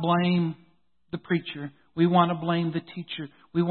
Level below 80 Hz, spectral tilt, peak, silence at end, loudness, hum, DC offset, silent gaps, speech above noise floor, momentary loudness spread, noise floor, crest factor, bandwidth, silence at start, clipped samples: -68 dBFS; -11.5 dB/octave; -8 dBFS; 0 s; -27 LUFS; none; under 0.1%; none; 40 dB; 16 LU; -65 dBFS; 20 dB; 4.4 kHz; 0 s; under 0.1%